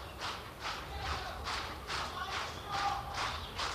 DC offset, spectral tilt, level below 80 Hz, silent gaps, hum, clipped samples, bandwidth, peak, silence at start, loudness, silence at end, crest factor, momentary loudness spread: under 0.1%; -3 dB/octave; -50 dBFS; none; none; under 0.1%; 15 kHz; -24 dBFS; 0 s; -38 LUFS; 0 s; 16 dB; 5 LU